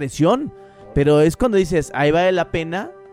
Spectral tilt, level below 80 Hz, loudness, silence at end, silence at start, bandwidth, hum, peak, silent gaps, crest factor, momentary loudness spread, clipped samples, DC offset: -6.5 dB/octave; -38 dBFS; -18 LUFS; 0.2 s; 0 s; 16 kHz; none; -4 dBFS; none; 14 dB; 10 LU; under 0.1%; under 0.1%